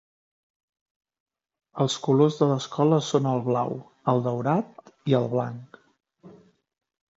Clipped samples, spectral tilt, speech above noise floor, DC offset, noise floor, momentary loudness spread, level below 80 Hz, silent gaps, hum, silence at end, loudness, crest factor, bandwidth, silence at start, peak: under 0.1%; -7 dB/octave; 31 dB; under 0.1%; -54 dBFS; 13 LU; -72 dBFS; none; none; 0.9 s; -25 LUFS; 20 dB; 8 kHz; 1.75 s; -6 dBFS